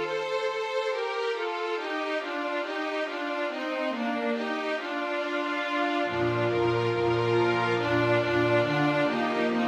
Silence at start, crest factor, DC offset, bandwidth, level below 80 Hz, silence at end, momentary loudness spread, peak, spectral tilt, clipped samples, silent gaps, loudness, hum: 0 s; 14 dB; under 0.1%; 10 kHz; -62 dBFS; 0 s; 6 LU; -12 dBFS; -6 dB/octave; under 0.1%; none; -27 LUFS; none